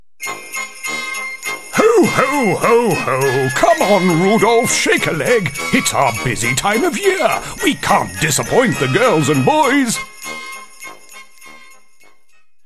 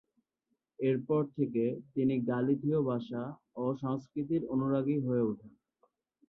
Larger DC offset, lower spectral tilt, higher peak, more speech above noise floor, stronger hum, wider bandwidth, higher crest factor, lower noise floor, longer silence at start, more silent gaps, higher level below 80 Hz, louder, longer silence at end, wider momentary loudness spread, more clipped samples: first, 1% vs under 0.1%; second, -4 dB/octave vs -10.5 dB/octave; first, 0 dBFS vs -18 dBFS; second, 46 dB vs 51 dB; neither; first, 14 kHz vs 6 kHz; about the same, 16 dB vs 14 dB; second, -60 dBFS vs -83 dBFS; second, 0.2 s vs 0.8 s; neither; first, -44 dBFS vs -70 dBFS; first, -15 LUFS vs -33 LUFS; first, 1.1 s vs 0.8 s; first, 13 LU vs 7 LU; neither